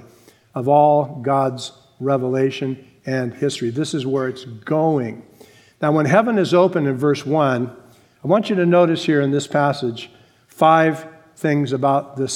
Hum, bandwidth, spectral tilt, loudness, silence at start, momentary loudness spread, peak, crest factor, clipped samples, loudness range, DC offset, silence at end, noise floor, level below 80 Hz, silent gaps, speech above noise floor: none; 16 kHz; -6.5 dB/octave; -18 LUFS; 0.55 s; 15 LU; 0 dBFS; 18 dB; under 0.1%; 5 LU; under 0.1%; 0 s; -50 dBFS; -68 dBFS; none; 32 dB